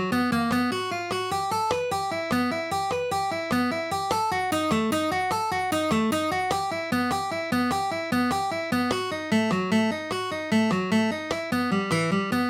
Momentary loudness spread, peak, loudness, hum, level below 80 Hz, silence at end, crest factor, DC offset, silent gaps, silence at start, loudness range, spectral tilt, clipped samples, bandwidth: 4 LU; -10 dBFS; -25 LUFS; none; -58 dBFS; 0 s; 16 dB; under 0.1%; none; 0 s; 1 LU; -4.5 dB/octave; under 0.1%; 18 kHz